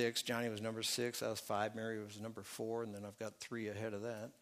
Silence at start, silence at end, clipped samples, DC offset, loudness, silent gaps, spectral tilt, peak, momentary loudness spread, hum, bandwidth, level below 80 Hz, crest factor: 0 s; 0.1 s; under 0.1%; under 0.1%; -42 LUFS; none; -3.5 dB/octave; -24 dBFS; 10 LU; none; 15.5 kHz; -82 dBFS; 18 dB